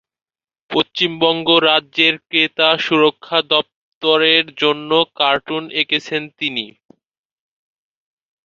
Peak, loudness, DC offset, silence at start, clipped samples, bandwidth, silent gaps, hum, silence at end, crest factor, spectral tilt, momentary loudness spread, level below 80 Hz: 0 dBFS; -16 LUFS; under 0.1%; 0.7 s; under 0.1%; 7.2 kHz; 3.75-4.01 s; none; 1.75 s; 18 dB; -4.5 dB/octave; 9 LU; -64 dBFS